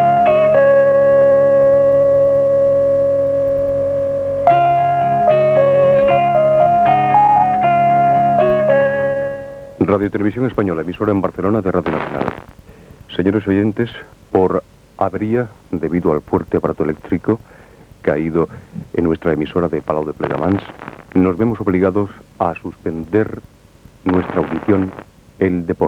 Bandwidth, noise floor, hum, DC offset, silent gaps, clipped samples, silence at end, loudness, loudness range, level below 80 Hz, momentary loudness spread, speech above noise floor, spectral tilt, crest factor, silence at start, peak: 5.8 kHz; -44 dBFS; none; under 0.1%; none; under 0.1%; 0 s; -15 LUFS; 7 LU; -46 dBFS; 11 LU; 27 dB; -9 dB/octave; 14 dB; 0 s; 0 dBFS